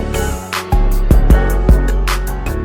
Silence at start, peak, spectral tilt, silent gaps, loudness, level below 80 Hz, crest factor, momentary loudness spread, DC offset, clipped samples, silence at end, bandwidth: 0 s; 0 dBFS; -6 dB/octave; none; -15 LUFS; -14 dBFS; 12 dB; 8 LU; under 0.1%; under 0.1%; 0 s; 17 kHz